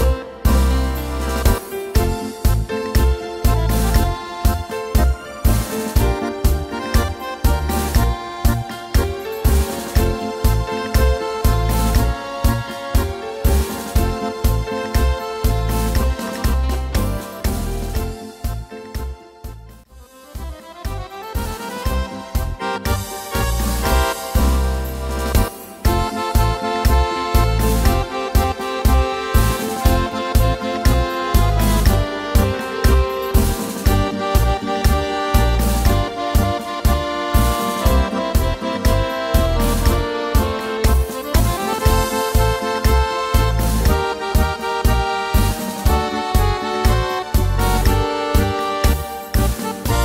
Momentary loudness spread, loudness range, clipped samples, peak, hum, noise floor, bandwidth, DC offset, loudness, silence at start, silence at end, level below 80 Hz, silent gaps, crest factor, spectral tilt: 7 LU; 6 LU; under 0.1%; 0 dBFS; none; -43 dBFS; 16.5 kHz; under 0.1%; -19 LUFS; 0 s; 0 s; -20 dBFS; none; 16 dB; -5.5 dB/octave